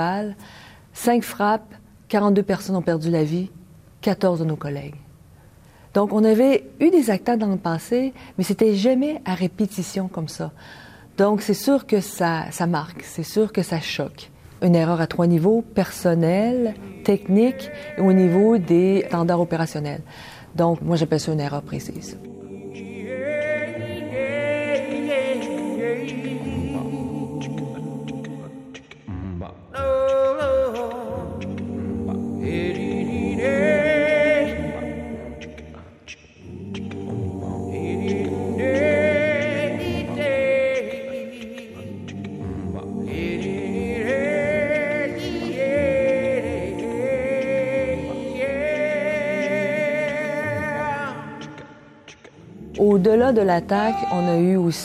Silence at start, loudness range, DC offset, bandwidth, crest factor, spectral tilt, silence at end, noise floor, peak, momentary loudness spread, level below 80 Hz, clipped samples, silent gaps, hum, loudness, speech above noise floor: 0 s; 7 LU; under 0.1%; 15.5 kHz; 18 dB; -6.5 dB/octave; 0 s; -49 dBFS; -4 dBFS; 16 LU; -50 dBFS; under 0.1%; none; none; -22 LUFS; 28 dB